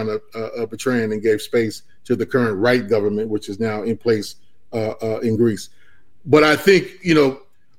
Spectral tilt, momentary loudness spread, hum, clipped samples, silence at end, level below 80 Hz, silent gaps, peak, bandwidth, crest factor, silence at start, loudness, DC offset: -5.5 dB/octave; 15 LU; none; under 0.1%; 0.4 s; -56 dBFS; none; -2 dBFS; 16 kHz; 18 dB; 0 s; -19 LUFS; 1%